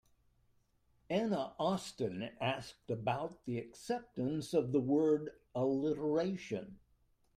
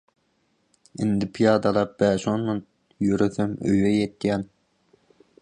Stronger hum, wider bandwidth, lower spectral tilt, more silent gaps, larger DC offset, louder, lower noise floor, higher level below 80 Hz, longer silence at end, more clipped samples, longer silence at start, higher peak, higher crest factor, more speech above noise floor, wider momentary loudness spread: neither; first, 15 kHz vs 9.8 kHz; about the same, -6.5 dB/octave vs -7 dB/octave; neither; neither; second, -37 LUFS vs -23 LUFS; first, -73 dBFS vs -69 dBFS; second, -70 dBFS vs -54 dBFS; second, 0.6 s vs 0.95 s; neither; about the same, 1.1 s vs 1 s; second, -20 dBFS vs -6 dBFS; about the same, 18 dB vs 18 dB; second, 37 dB vs 46 dB; about the same, 10 LU vs 9 LU